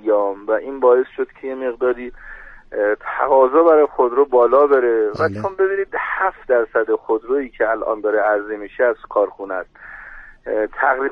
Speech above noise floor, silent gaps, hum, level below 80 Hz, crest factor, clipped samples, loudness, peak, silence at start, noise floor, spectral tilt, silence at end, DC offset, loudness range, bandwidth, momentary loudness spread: 21 dB; none; none; -50 dBFS; 16 dB; under 0.1%; -18 LUFS; -2 dBFS; 0.05 s; -39 dBFS; -8 dB/octave; 0 s; under 0.1%; 5 LU; 5.4 kHz; 15 LU